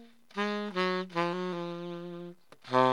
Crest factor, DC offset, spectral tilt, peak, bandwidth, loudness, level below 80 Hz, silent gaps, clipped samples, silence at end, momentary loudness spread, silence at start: 22 dB; 0.1%; -6 dB/octave; -10 dBFS; 11.5 kHz; -33 LUFS; -86 dBFS; none; under 0.1%; 0 s; 13 LU; 0 s